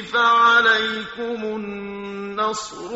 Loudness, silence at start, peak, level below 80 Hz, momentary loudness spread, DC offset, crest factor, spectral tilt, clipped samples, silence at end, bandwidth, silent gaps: -19 LUFS; 0 s; -4 dBFS; -58 dBFS; 17 LU; under 0.1%; 16 dB; 0 dB/octave; under 0.1%; 0 s; 8 kHz; none